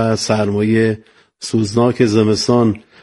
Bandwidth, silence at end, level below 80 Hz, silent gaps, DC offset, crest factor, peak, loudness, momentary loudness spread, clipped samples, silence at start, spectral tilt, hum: 11.5 kHz; 0.25 s; -50 dBFS; none; under 0.1%; 16 dB; 0 dBFS; -15 LUFS; 7 LU; under 0.1%; 0 s; -6 dB/octave; none